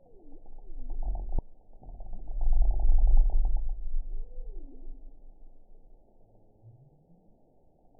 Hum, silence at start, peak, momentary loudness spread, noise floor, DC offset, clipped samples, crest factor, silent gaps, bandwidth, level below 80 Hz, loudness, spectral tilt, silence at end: none; 0.25 s; -10 dBFS; 26 LU; -62 dBFS; under 0.1%; under 0.1%; 16 dB; none; 1 kHz; -28 dBFS; -33 LUFS; -14.5 dB/octave; 2.7 s